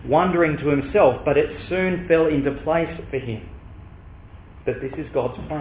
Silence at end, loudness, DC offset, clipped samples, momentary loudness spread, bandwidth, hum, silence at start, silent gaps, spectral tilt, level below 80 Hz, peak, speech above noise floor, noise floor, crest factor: 0 s; -21 LUFS; 0.1%; under 0.1%; 12 LU; 4 kHz; none; 0 s; none; -11 dB/octave; -42 dBFS; -4 dBFS; 22 dB; -42 dBFS; 18 dB